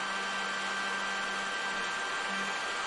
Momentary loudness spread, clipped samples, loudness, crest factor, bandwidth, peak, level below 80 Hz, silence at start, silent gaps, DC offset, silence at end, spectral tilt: 1 LU; under 0.1%; -32 LUFS; 12 dB; 11.5 kHz; -22 dBFS; -68 dBFS; 0 s; none; under 0.1%; 0 s; -1 dB/octave